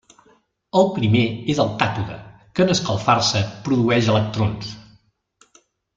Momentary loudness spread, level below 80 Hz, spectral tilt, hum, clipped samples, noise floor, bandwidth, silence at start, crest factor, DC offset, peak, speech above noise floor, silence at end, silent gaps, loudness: 13 LU; -52 dBFS; -5.5 dB/octave; none; under 0.1%; -59 dBFS; 7.6 kHz; 0.75 s; 20 dB; under 0.1%; 0 dBFS; 40 dB; 1.15 s; none; -20 LUFS